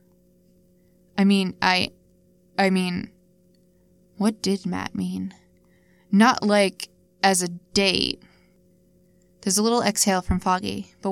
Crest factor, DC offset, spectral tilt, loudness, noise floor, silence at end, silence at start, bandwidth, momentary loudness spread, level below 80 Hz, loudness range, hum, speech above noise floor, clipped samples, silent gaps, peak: 22 dB; under 0.1%; -4 dB/octave; -22 LUFS; -59 dBFS; 0 s; 1.15 s; 16 kHz; 13 LU; -46 dBFS; 5 LU; none; 37 dB; under 0.1%; none; -2 dBFS